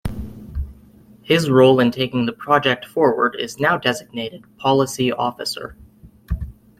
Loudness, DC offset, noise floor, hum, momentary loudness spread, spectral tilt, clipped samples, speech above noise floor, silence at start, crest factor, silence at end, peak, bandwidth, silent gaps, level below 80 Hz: -19 LUFS; under 0.1%; -47 dBFS; none; 18 LU; -5.5 dB/octave; under 0.1%; 29 dB; 0.05 s; 18 dB; 0.3 s; -2 dBFS; 15.5 kHz; none; -38 dBFS